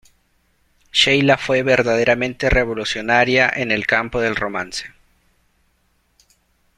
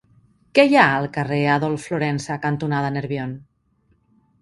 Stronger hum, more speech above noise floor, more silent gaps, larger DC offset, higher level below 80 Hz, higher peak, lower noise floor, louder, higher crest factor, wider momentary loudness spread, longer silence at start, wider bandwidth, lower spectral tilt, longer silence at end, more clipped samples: neither; about the same, 45 dB vs 44 dB; neither; neither; first, -38 dBFS vs -58 dBFS; about the same, 0 dBFS vs 0 dBFS; about the same, -63 dBFS vs -63 dBFS; first, -17 LUFS vs -20 LUFS; about the same, 20 dB vs 22 dB; second, 10 LU vs 13 LU; first, 0.95 s vs 0.55 s; first, 13.5 kHz vs 11.5 kHz; second, -4 dB/octave vs -6 dB/octave; first, 1.9 s vs 1 s; neither